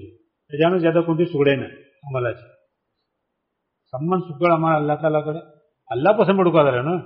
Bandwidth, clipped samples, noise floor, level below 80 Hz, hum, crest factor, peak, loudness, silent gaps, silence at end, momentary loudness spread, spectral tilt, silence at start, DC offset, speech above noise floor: 5.4 kHz; under 0.1%; -77 dBFS; -62 dBFS; none; 18 dB; -4 dBFS; -20 LUFS; none; 0 s; 14 LU; -6 dB/octave; 0 s; under 0.1%; 58 dB